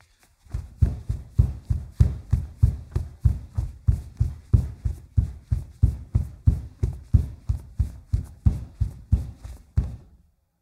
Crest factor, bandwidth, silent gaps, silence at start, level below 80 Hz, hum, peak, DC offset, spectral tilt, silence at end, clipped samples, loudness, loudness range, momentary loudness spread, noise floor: 22 dB; 10 kHz; none; 0.5 s; -30 dBFS; none; -4 dBFS; under 0.1%; -9 dB/octave; 0.65 s; under 0.1%; -27 LUFS; 2 LU; 9 LU; -58 dBFS